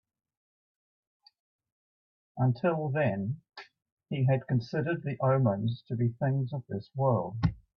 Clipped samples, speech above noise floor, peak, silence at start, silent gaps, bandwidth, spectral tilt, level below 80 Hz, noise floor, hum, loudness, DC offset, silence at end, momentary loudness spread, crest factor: under 0.1%; over 61 dB; -12 dBFS; 2.35 s; 3.92-3.97 s; 5.8 kHz; -10 dB/octave; -56 dBFS; under -90 dBFS; none; -30 LUFS; under 0.1%; 0.2 s; 11 LU; 18 dB